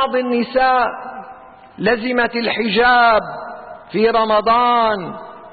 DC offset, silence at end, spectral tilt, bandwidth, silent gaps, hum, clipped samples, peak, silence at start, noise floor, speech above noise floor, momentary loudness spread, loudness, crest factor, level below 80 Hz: under 0.1%; 0.05 s; -10 dB/octave; 4.8 kHz; none; none; under 0.1%; -4 dBFS; 0 s; -39 dBFS; 24 dB; 18 LU; -16 LUFS; 12 dB; -48 dBFS